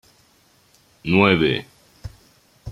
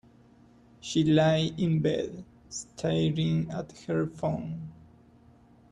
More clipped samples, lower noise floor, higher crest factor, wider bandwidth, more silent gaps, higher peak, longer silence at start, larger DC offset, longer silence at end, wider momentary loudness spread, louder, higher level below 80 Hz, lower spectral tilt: neither; about the same, -58 dBFS vs -57 dBFS; about the same, 22 dB vs 18 dB; first, 13 kHz vs 10 kHz; neither; first, 0 dBFS vs -12 dBFS; first, 1.05 s vs 0.85 s; neither; second, 0 s vs 0.95 s; first, 25 LU vs 17 LU; first, -18 LUFS vs -28 LUFS; first, -50 dBFS vs -58 dBFS; about the same, -7 dB/octave vs -6.5 dB/octave